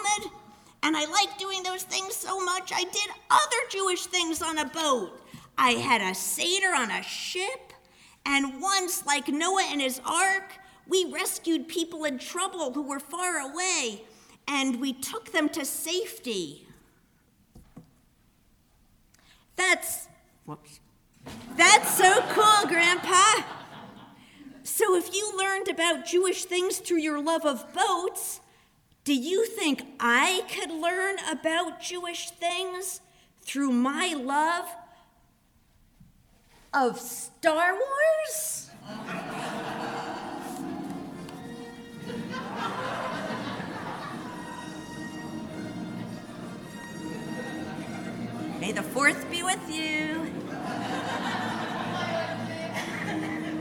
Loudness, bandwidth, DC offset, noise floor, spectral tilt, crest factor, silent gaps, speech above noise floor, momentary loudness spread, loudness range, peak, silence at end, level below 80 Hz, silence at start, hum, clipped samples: -27 LUFS; over 20 kHz; under 0.1%; -64 dBFS; -2 dB/octave; 26 dB; none; 37 dB; 16 LU; 13 LU; -2 dBFS; 0 s; -66 dBFS; 0 s; none; under 0.1%